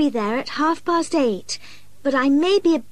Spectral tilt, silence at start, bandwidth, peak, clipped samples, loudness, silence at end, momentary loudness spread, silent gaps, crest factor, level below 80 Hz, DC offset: -4 dB/octave; 0 s; 12 kHz; -8 dBFS; under 0.1%; -20 LUFS; 0.1 s; 11 LU; none; 12 dB; -58 dBFS; 1%